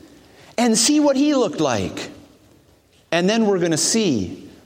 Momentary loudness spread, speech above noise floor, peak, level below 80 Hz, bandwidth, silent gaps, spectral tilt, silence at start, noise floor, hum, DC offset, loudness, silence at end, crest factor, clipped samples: 14 LU; 37 dB; -2 dBFS; -58 dBFS; 16.5 kHz; none; -3.5 dB/octave; 0.6 s; -55 dBFS; none; under 0.1%; -18 LUFS; 0.15 s; 18 dB; under 0.1%